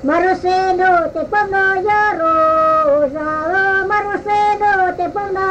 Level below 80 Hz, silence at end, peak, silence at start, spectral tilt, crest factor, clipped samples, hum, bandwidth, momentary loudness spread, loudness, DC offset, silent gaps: -44 dBFS; 0 s; -4 dBFS; 0 s; -5.5 dB/octave; 10 dB; under 0.1%; none; 8.8 kHz; 5 LU; -15 LUFS; under 0.1%; none